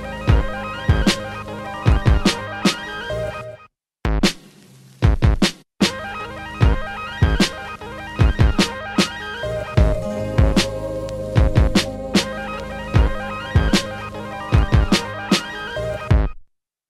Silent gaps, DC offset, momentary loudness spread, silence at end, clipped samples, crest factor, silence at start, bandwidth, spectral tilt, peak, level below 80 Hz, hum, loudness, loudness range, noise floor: none; under 0.1%; 12 LU; 0.45 s; under 0.1%; 16 dB; 0 s; 13.5 kHz; -5.5 dB/octave; -2 dBFS; -24 dBFS; none; -20 LUFS; 2 LU; -50 dBFS